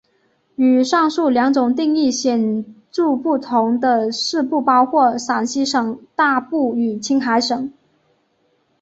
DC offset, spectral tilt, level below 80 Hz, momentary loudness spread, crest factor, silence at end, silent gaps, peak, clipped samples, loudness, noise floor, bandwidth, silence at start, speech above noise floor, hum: under 0.1%; -3.5 dB/octave; -64 dBFS; 7 LU; 16 dB; 1.1 s; none; -2 dBFS; under 0.1%; -17 LUFS; -63 dBFS; 8 kHz; 0.6 s; 46 dB; none